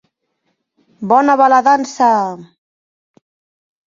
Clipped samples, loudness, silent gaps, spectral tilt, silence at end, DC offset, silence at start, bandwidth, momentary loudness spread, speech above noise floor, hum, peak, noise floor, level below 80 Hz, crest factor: under 0.1%; -12 LUFS; none; -5 dB/octave; 1.45 s; under 0.1%; 1 s; 7.6 kHz; 16 LU; 56 dB; none; 0 dBFS; -68 dBFS; -64 dBFS; 16 dB